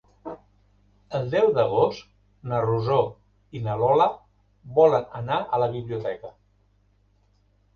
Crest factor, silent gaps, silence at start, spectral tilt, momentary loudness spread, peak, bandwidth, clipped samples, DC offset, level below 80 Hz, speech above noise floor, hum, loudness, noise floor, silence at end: 20 dB; none; 0.25 s; -8 dB/octave; 21 LU; -6 dBFS; 6.8 kHz; under 0.1%; under 0.1%; -58 dBFS; 40 dB; 50 Hz at -55 dBFS; -24 LUFS; -63 dBFS; 1.45 s